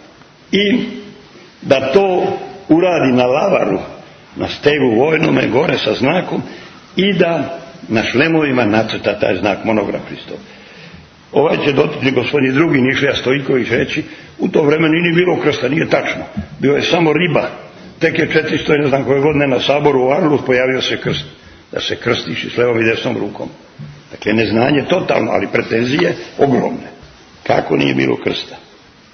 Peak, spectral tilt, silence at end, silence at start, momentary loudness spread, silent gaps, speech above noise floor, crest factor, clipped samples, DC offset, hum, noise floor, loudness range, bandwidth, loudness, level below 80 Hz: 0 dBFS; -6 dB/octave; 0.55 s; 0.5 s; 13 LU; none; 28 dB; 16 dB; under 0.1%; under 0.1%; none; -42 dBFS; 3 LU; 6.6 kHz; -15 LUFS; -48 dBFS